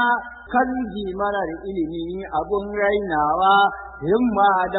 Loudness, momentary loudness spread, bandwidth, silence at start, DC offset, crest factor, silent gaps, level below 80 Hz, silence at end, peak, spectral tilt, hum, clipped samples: -21 LUFS; 10 LU; 4.1 kHz; 0 s; under 0.1%; 16 dB; none; -46 dBFS; 0 s; -6 dBFS; -10 dB/octave; none; under 0.1%